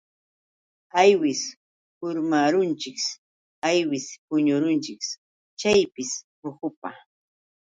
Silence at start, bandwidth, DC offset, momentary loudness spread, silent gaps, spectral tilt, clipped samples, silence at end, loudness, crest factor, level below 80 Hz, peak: 0.95 s; 9.2 kHz; under 0.1%; 16 LU; 1.56-2.01 s, 3.18-3.62 s, 4.18-4.28 s, 5.18-5.57 s, 6.24-6.42 s, 6.77-6.82 s; -4 dB/octave; under 0.1%; 0.7 s; -24 LUFS; 20 dB; -66 dBFS; -4 dBFS